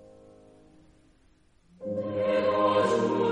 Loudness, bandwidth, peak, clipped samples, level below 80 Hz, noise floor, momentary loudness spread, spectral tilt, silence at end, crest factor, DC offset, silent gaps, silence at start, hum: -26 LUFS; 10 kHz; -12 dBFS; under 0.1%; -64 dBFS; -62 dBFS; 11 LU; -6 dB/octave; 0 s; 16 dB; under 0.1%; none; 1.8 s; none